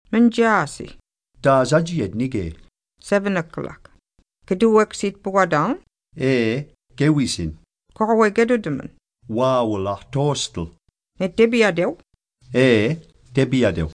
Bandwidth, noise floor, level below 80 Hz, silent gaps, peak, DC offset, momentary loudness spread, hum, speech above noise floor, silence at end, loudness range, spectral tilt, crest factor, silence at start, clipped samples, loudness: 10.5 kHz; -61 dBFS; -46 dBFS; none; -4 dBFS; under 0.1%; 15 LU; none; 42 dB; 0.05 s; 2 LU; -6 dB/octave; 18 dB; 0.1 s; under 0.1%; -20 LUFS